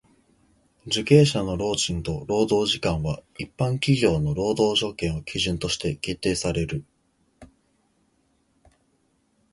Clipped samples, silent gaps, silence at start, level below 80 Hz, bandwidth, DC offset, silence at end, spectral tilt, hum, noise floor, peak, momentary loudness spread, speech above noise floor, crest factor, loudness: under 0.1%; none; 0.85 s; -44 dBFS; 11.5 kHz; under 0.1%; 2.05 s; -5 dB/octave; none; -67 dBFS; -2 dBFS; 10 LU; 44 dB; 22 dB; -24 LUFS